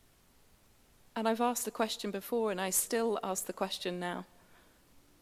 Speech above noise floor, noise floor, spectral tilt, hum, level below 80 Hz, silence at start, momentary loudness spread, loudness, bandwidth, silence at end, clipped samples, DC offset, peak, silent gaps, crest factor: 30 dB; -64 dBFS; -3 dB/octave; none; -72 dBFS; 1.15 s; 9 LU; -34 LUFS; 16 kHz; 0.2 s; under 0.1%; under 0.1%; -16 dBFS; none; 20 dB